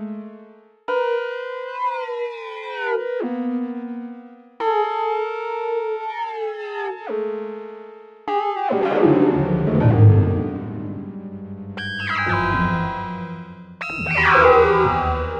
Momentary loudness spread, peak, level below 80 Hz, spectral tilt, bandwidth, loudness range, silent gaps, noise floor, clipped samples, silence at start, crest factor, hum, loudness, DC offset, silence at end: 19 LU; -2 dBFS; -42 dBFS; -8.5 dB/octave; 6.8 kHz; 8 LU; none; -47 dBFS; under 0.1%; 0 s; 18 dB; none; -20 LUFS; under 0.1%; 0 s